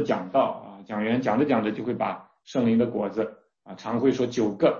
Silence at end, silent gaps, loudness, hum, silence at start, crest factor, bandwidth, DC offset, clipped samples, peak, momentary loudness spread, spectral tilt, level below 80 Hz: 0 s; none; -26 LUFS; none; 0 s; 16 dB; 7.2 kHz; under 0.1%; under 0.1%; -8 dBFS; 12 LU; -7 dB/octave; -62 dBFS